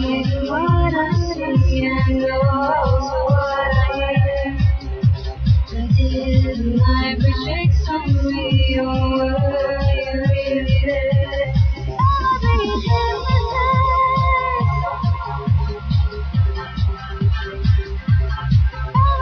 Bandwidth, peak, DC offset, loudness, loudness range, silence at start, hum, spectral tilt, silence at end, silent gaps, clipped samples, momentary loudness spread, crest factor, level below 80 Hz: 6.4 kHz; -4 dBFS; under 0.1%; -18 LUFS; 2 LU; 0 s; none; -8 dB/octave; 0 s; none; under 0.1%; 4 LU; 14 dB; -24 dBFS